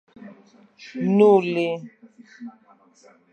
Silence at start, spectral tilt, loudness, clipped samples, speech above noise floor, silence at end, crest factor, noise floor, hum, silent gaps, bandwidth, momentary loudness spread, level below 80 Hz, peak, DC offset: 0.2 s; -8 dB/octave; -20 LUFS; under 0.1%; 36 dB; 0.8 s; 20 dB; -56 dBFS; none; none; 8.4 kHz; 26 LU; -76 dBFS; -4 dBFS; under 0.1%